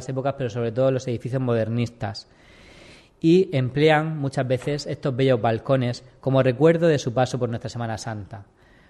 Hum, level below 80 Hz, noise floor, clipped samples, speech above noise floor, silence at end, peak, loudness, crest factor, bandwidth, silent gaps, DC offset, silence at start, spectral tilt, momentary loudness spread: none; -56 dBFS; -49 dBFS; under 0.1%; 27 dB; 0.45 s; -6 dBFS; -23 LUFS; 18 dB; 11 kHz; none; under 0.1%; 0 s; -7 dB/octave; 12 LU